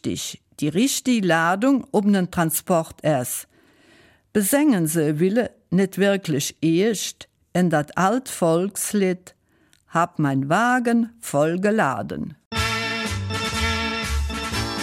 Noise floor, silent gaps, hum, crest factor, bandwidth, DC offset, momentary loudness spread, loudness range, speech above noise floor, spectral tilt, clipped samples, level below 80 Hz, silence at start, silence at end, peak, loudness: -61 dBFS; 12.46-12.51 s; none; 16 dB; 16.5 kHz; under 0.1%; 8 LU; 2 LU; 40 dB; -4.5 dB/octave; under 0.1%; -40 dBFS; 0.05 s; 0 s; -6 dBFS; -22 LUFS